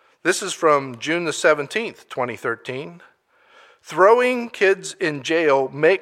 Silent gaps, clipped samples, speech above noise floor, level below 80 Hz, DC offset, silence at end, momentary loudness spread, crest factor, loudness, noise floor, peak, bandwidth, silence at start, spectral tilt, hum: none; under 0.1%; 35 dB; -74 dBFS; under 0.1%; 0 s; 13 LU; 18 dB; -20 LUFS; -54 dBFS; -2 dBFS; 14.5 kHz; 0.25 s; -3.5 dB/octave; none